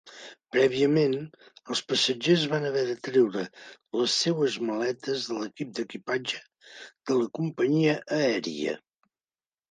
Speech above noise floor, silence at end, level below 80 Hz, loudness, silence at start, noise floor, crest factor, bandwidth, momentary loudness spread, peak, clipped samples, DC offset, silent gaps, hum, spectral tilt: over 63 dB; 0.95 s; -74 dBFS; -27 LUFS; 0.05 s; under -90 dBFS; 20 dB; 9.8 kHz; 13 LU; -8 dBFS; under 0.1%; under 0.1%; none; none; -4.5 dB/octave